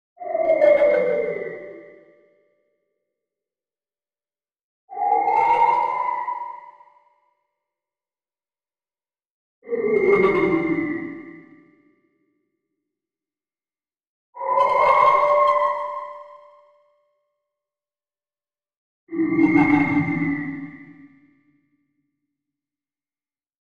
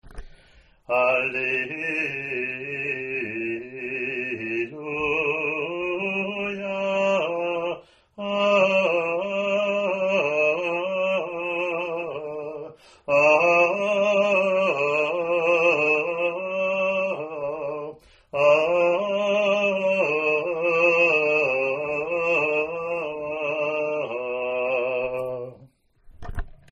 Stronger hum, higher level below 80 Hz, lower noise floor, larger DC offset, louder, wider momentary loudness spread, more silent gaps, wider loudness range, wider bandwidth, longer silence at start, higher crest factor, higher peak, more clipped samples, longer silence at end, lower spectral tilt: neither; second, -60 dBFS vs -50 dBFS; first, under -90 dBFS vs -55 dBFS; neither; first, -20 LUFS vs -23 LUFS; first, 19 LU vs 11 LU; first, 4.63-4.88 s, 9.30-9.62 s, 14.07-14.33 s, 18.77-19.07 s vs none; first, 15 LU vs 6 LU; about the same, 7.6 kHz vs 8 kHz; first, 0.2 s vs 0.05 s; about the same, 20 dB vs 18 dB; about the same, -4 dBFS vs -6 dBFS; neither; first, 2.7 s vs 0.2 s; first, -8 dB/octave vs -5 dB/octave